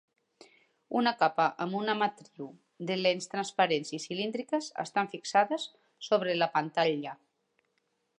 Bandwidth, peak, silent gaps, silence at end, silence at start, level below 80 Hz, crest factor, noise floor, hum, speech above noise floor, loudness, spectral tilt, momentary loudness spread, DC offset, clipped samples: 10.5 kHz; -10 dBFS; none; 1.05 s; 0.9 s; -86 dBFS; 22 dB; -77 dBFS; none; 47 dB; -30 LUFS; -4 dB/octave; 15 LU; under 0.1%; under 0.1%